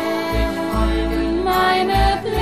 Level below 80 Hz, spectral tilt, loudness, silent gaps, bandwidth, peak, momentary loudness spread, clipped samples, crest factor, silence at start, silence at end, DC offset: -24 dBFS; -5.5 dB/octave; -19 LUFS; none; 15.5 kHz; -4 dBFS; 5 LU; under 0.1%; 14 dB; 0 s; 0 s; 0.6%